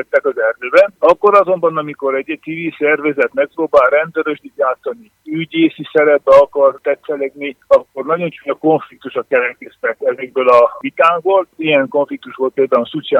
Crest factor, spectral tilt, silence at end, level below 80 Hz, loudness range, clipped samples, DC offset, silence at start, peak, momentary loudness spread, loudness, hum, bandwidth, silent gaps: 14 dB; -6.5 dB/octave; 0 s; -58 dBFS; 3 LU; under 0.1%; under 0.1%; 0 s; 0 dBFS; 12 LU; -14 LUFS; none; 7 kHz; none